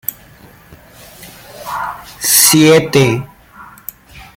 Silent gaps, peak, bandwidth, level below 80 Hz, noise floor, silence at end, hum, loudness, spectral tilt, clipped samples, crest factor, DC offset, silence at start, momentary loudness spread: none; 0 dBFS; 17 kHz; -48 dBFS; -41 dBFS; 0.15 s; none; -10 LUFS; -3.5 dB/octave; under 0.1%; 16 dB; under 0.1%; 0.1 s; 24 LU